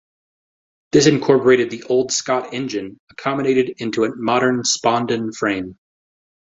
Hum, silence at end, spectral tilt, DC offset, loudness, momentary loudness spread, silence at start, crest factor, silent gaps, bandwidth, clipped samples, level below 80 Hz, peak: none; 0.8 s; -4 dB/octave; under 0.1%; -18 LUFS; 12 LU; 0.95 s; 18 dB; 2.99-3.07 s; 8.2 kHz; under 0.1%; -58 dBFS; 0 dBFS